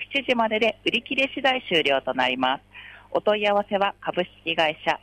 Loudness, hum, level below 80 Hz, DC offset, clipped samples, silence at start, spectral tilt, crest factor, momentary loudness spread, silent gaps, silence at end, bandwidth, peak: -23 LUFS; none; -60 dBFS; under 0.1%; under 0.1%; 0 s; -4.5 dB/octave; 14 dB; 7 LU; none; 0.05 s; 11.5 kHz; -10 dBFS